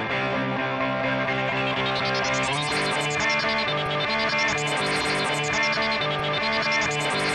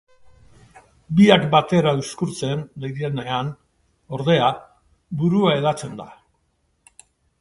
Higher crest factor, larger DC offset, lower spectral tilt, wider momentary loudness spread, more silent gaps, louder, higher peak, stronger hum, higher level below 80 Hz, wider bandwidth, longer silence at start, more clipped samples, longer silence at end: second, 12 dB vs 22 dB; neither; second, -3.5 dB/octave vs -6 dB/octave; second, 3 LU vs 17 LU; neither; second, -23 LUFS vs -20 LUFS; second, -12 dBFS vs 0 dBFS; neither; about the same, -52 dBFS vs -56 dBFS; first, 13 kHz vs 11.5 kHz; second, 0 s vs 1.1 s; neither; second, 0 s vs 1.25 s